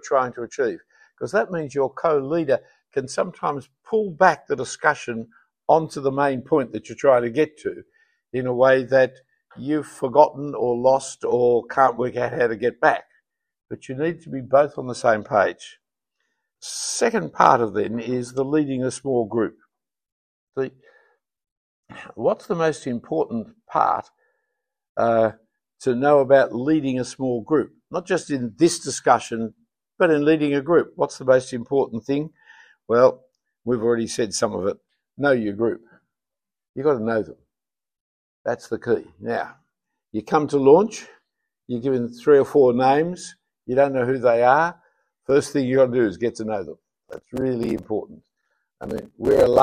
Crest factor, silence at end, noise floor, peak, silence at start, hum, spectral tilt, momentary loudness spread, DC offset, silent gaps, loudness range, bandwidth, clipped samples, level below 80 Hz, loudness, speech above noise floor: 22 dB; 0 s; under -90 dBFS; 0 dBFS; 0.05 s; none; -5.5 dB/octave; 15 LU; under 0.1%; 20.12-20.47 s, 21.52-21.83 s, 24.89-24.95 s, 36.69-36.74 s, 38.01-38.45 s; 7 LU; 14 kHz; under 0.1%; -58 dBFS; -21 LUFS; over 69 dB